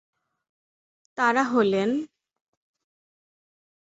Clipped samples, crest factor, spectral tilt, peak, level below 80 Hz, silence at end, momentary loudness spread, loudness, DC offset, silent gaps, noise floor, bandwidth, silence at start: under 0.1%; 20 dB; -5.5 dB/octave; -8 dBFS; -72 dBFS; 1.75 s; 17 LU; -23 LUFS; under 0.1%; none; under -90 dBFS; 8 kHz; 1.15 s